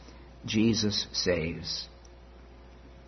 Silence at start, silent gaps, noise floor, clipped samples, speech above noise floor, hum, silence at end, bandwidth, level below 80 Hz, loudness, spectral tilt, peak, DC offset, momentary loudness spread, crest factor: 0 s; none; -50 dBFS; under 0.1%; 22 dB; none; 0 s; 6.4 kHz; -52 dBFS; -29 LUFS; -4.5 dB/octave; -12 dBFS; under 0.1%; 19 LU; 18 dB